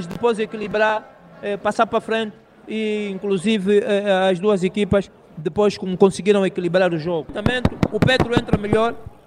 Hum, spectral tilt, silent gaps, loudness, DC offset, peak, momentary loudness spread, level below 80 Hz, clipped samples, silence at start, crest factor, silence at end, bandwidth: none; -6 dB/octave; none; -20 LUFS; under 0.1%; -2 dBFS; 8 LU; -44 dBFS; under 0.1%; 0 s; 18 dB; 0.2 s; 11.5 kHz